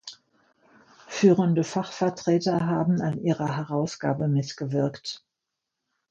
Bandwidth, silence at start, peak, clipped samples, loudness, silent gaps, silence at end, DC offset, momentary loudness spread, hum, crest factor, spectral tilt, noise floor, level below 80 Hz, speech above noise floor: 8 kHz; 0.05 s; -6 dBFS; under 0.1%; -25 LUFS; none; 0.9 s; under 0.1%; 12 LU; none; 20 dB; -6.5 dB/octave; -84 dBFS; -66 dBFS; 60 dB